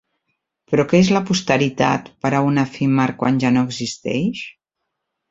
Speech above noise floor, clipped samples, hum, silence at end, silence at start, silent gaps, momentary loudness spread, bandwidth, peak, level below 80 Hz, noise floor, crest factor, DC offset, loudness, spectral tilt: 61 dB; under 0.1%; none; 0.8 s; 0.7 s; none; 8 LU; 8 kHz; 0 dBFS; -54 dBFS; -78 dBFS; 18 dB; under 0.1%; -18 LUFS; -6 dB/octave